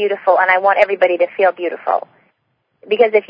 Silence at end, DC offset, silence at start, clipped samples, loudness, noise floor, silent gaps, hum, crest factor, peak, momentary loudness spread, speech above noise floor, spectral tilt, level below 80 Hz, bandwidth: 0.1 s; under 0.1%; 0 s; under 0.1%; -15 LUFS; -67 dBFS; none; none; 16 dB; 0 dBFS; 9 LU; 53 dB; -5.5 dB/octave; -70 dBFS; 5.6 kHz